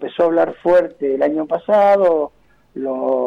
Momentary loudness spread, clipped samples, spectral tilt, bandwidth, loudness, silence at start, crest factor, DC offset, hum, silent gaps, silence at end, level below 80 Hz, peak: 13 LU; under 0.1%; -7.5 dB/octave; 6.2 kHz; -16 LUFS; 0 s; 10 dB; under 0.1%; none; none; 0 s; -58 dBFS; -6 dBFS